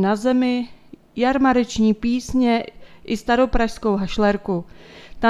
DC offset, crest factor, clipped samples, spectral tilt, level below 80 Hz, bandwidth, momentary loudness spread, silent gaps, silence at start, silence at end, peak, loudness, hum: under 0.1%; 18 dB; under 0.1%; -5.5 dB/octave; -38 dBFS; 12 kHz; 9 LU; none; 0 s; 0 s; -2 dBFS; -20 LUFS; none